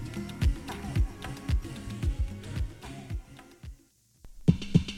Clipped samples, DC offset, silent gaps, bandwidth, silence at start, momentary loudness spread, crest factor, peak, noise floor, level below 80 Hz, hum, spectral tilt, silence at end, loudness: under 0.1%; under 0.1%; none; 15.5 kHz; 0 s; 20 LU; 24 dB; -8 dBFS; -62 dBFS; -36 dBFS; none; -7 dB/octave; 0 s; -32 LUFS